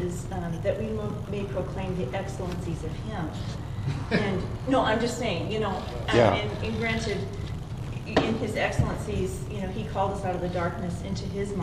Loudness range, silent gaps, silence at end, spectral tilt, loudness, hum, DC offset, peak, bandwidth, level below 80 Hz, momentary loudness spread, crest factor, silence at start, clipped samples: 5 LU; none; 0 s; -6 dB/octave; -29 LUFS; none; under 0.1%; -6 dBFS; 14.5 kHz; -40 dBFS; 9 LU; 22 dB; 0 s; under 0.1%